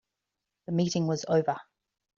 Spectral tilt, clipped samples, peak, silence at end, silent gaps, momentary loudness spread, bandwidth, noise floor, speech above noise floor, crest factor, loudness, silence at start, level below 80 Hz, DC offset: -6 dB/octave; under 0.1%; -14 dBFS; 0.55 s; none; 11 LU; 7.6 kHz; -86 dBFS; 59 dB; 16 dB; -29 LUFS; 0.7 s; -70 dBFS; under 0.1%